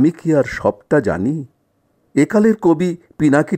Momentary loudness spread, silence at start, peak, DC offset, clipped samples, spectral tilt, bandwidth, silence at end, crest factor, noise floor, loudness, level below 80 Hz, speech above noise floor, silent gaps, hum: 8 LU; 0 s; -2 dBFS; under 0.1%; under 0.1%; -7.5 dB/octave; 9.2 kHz; 0 s; 14 dB; -63 dBFS; -17 LUFS; -48 dBFS; 47 dB; none; none